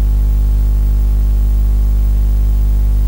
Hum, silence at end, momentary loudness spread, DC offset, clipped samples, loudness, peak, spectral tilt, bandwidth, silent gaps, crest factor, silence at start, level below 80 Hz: 50 Hz at -10 dBFS; 0 s; 0 LU; under 0.1%; under 0.1%; -15 LUFS; -6 dBFS; -8 dB/octave; 16 kHz; none; 6 dB; 0 s; -12 dBFS